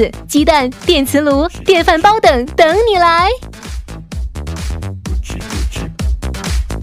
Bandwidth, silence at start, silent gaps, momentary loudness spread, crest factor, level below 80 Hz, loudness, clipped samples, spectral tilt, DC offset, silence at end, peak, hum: 16 kHz; 0 s; none; 15 LU; 14 dB; -24 dBFS; -13 LUFS; 0.1%; -5 dB/octave; under 0.1%; 0 s; 0 dBFS; none